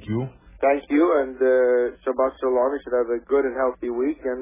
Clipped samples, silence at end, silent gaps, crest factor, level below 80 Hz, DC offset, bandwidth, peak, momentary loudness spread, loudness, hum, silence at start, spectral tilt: under 0.1%; 0 s; none; 14 dB; -52 dBFS; under 0.1%; 3.8 kHz; -8 dBFS; 6 LU; -22 LUFS; none; 0 s; -11 dB/octave